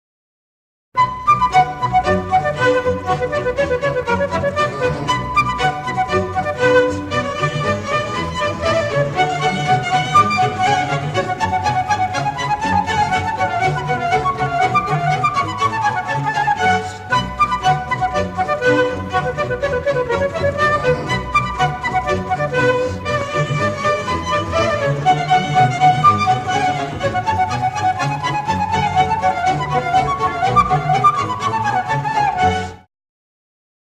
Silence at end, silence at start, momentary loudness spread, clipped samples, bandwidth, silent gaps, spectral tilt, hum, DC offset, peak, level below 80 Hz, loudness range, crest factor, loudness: 1.05 s; 0.95 s; 6 LU; under 0.1%; 12.5 kHz; none; -5 dB/octave; none; under 0.1%; -2 dBFS; -42 dBFS; 2 LU; 16 dB; -17 LUFS